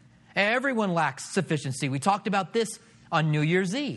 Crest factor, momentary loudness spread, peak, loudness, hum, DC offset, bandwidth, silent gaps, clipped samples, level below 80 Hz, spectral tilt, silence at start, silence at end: 20 dB; 6 LU; -6 dBFS; -26 LUFS; none; under 0.1%; 12 kHz; none; under 0.1%; -70 dBFS; -5 dB/octave; 0.35 s; 0 s